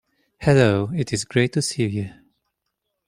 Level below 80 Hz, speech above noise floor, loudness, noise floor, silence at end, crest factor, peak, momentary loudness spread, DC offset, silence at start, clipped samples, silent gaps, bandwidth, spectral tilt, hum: -50 dBFS; 58 dB; -21 LUFS; -78 dBFS; 1 s; 20 dB; -2 dBFS; 9 LU; under 0.1%; 0.4 s; under 0.1%; none; 15 kHz; -5.5 dB/octave; none